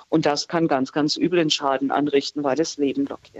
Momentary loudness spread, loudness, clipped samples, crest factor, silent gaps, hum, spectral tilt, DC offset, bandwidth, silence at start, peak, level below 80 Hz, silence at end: 4 LU; -22 LUFS; under 0.1%; 16 dB; none; none; -4.5 dB/octave; under 0.1%; 8.2 kHz; 0.1 s; -6 dBFS; -68 dBFS; 0 s